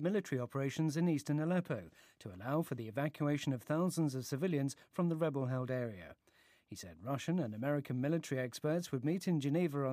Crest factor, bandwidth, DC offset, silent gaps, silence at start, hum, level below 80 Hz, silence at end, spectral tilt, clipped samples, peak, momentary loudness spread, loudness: 14 dB; 15.5 kHz; under 0.1%; none; 0 s; none; -80 dBFS; 0 s; -7 dB/octave; under 0.1%; -22 dBFS; 10 LU; -37 LUFS